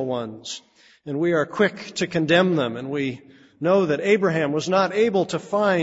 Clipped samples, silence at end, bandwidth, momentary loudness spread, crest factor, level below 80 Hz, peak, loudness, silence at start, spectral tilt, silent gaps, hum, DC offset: under 0.1%; 0 s; 8 kHz; 13 LU; 18 dB; -64 dBFS; -4 dBFS; -22 LUFS; 0 s; -5.5 dB/octave; none; none; under 0.1%